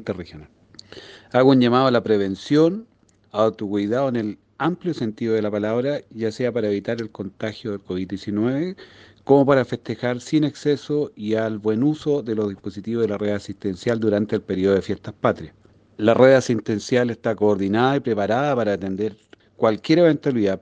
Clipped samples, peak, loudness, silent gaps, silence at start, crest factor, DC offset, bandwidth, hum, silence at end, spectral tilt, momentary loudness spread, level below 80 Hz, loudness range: under 0.1%; -2 dBFS; -21 LUFS; none; 0 s; 20 dB; under 0.1%; 9.2 kHz; none; 0.05 s; -7 dB/octave; 13 LU; -60 dBFS; 5 LU